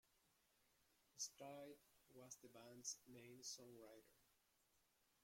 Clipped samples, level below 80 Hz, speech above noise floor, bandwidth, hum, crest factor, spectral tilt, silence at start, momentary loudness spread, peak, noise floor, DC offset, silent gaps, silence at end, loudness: under 0.1%; under -90 dBFS; 23 dB; 16.5 kHz; none; 24 dB; -2 dB/octave; 0.05 s; 14 LU; -38 dBFS; -83 dBFS; under 0.1%; none; 0 s; -57 LUFS